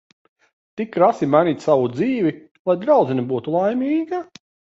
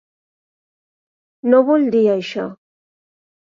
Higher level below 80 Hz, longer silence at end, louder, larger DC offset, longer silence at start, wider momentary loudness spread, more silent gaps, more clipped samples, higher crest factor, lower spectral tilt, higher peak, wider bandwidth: about the same, -64 dBFS vs -68 dBFS; second, 0.55 s vs 0.85 s; second, -19 LUFS vs -16 LUFS; neither; second, 0.75 s vs 1.45 s; about the same, 11 LU vs 13 LU; first, 2.51-2.65 s vs none; neither; about the same, 18 dB vs 18 dB; about the same, -8 dB/octave vs -7 dB/octave; about the same, -2 dBFS vs -2 dBFS; about the same, 7.8 kHz vs 7.4 kHz